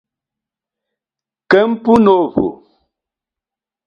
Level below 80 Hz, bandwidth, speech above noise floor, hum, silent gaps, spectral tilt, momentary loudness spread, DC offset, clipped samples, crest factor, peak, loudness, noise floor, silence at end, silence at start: -50 dBFS; 7.6 kHz; 76 dB; none; none; -7.5 dB/octave; 9 LU; under 0.1%; under 0.1%; 16 dB; 0 dBFS; -13 LUFS; -88 dBFS; 1.3 s; 1.5 s